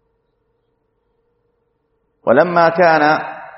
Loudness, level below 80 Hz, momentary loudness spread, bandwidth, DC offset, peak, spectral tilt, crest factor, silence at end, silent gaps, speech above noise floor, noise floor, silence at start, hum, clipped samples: -13 LUFS; -62 dBFS; 7 LU; 6 kHz; under 0.1%; 0 dBFS; -4 dB/octave; 18 dB; 0.1 s; none; 54 dB; -66 dBFS; 2.25 s; none; under 0.1%